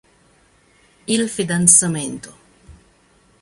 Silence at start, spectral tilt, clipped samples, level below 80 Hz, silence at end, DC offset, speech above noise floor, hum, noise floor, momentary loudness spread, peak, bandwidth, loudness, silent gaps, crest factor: 1.1 s; -3 dB/octave; under 0.1%; -54 dBFS; 0.7 s; under 0.1%; 38 dB; none; -56 dBFS; 21 LU; 0 dBFS; 15 kHz; -15 LUFS; none; 22 dB